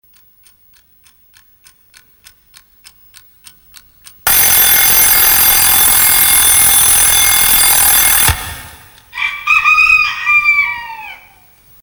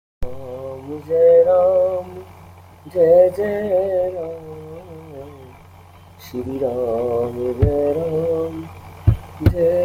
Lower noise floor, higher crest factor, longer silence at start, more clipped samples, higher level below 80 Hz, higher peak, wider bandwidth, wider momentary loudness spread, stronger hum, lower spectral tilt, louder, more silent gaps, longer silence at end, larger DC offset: first, -49 dBFS vs -44 dBFS; about the same, 12 dB vs 16 dB; first, 4.25 s vs 0.2 s; neither; about the same, -34 dBFS vs -36 dBFS; about the same, 0 dBFS vs -2 dBFS; first, over 20 kHz vs 15.5 kHz; second, 13 LU vs 23 LU; neither; second, 1 dB/octave vs -9 dB/octave; first, -7 LUFS vs -18 LUFS; neither; first, 0.65 s vs 0 s; neither